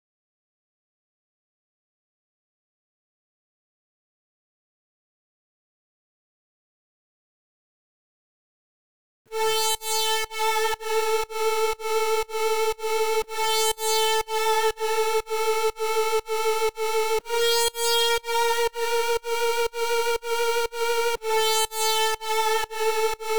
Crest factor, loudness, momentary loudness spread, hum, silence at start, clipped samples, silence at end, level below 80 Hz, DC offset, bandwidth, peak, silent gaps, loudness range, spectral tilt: 16 dB; -24 LUFS; 4 LU; none; 9.25 s; under 0.1%; 0 s; -56 dBFS; 2%; over 20 kHz; -12 dBFS; none; 3 LU; 1 dB/octave